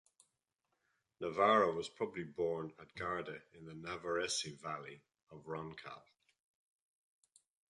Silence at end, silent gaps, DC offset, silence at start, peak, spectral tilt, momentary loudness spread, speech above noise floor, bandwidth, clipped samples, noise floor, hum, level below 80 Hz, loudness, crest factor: 1.7 s; 5.23-5.27 s; under 0.1%; 1.2 s; -18 dBFS; -3.5 dB/octave; 21 LU; 48 dB; 11.5 kHz; under 0.1%; -87 dBFS; none; -74 dBFS; -38 LUFS; 24 dB